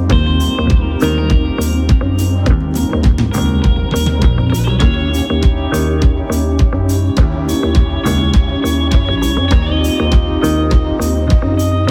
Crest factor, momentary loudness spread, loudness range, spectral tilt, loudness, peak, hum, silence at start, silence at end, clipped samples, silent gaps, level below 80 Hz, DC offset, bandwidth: 12 dB; 3 LU; 0 LU; -6.5 dB/octave; -14 LUFS; 0 dBFS; none; 0 s; 0 s; under 0.1%; none; -16 dBFS; under 0.1%; 16.5 kHz